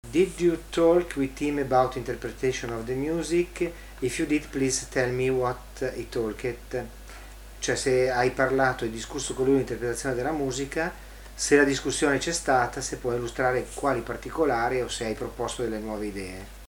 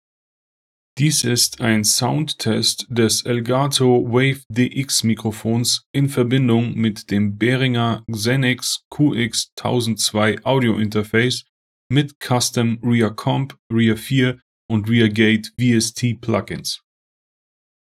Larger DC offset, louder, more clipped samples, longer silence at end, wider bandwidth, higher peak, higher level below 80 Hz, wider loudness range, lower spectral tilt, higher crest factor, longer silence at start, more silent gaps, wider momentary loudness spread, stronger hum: neither; second, -27 LUFS vs -18 LUFS; neither; second, 0.05 s vs 1.05 s; first, 20 kHz vs 16 kHz; second, -8 dBFS vs -2 dBFS; first, -44 dBFS vs -56 dBFS; about the same, 3 LU vs 2 LU; about the same, -4.5 dB/octave vs -4.5 dB/octave; about the same, 20 dB vs 18 dB; second, 0.05 s vs 0.95 s; second, none vs 4.46-4.50 s, 5.86-5.94 s, 8.85-8.91 s, 9.52-9.57 s, 11.49-11.90 s, 12.15-12.21 s, 13.59-13.70 s, 14.42-14.69 s; first, 10 LU vs 6 LU; neither